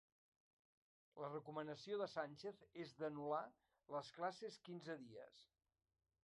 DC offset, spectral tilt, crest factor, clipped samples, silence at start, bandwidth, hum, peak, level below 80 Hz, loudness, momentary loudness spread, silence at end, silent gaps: under 0.1%; -5.5 dB/octave; 20 dB; under 0.1%; 1.15 s; 11 kHz; none; -32 dBFS; under -90 dBFS; -50 LUFS; 12 LU; 0.8 s; none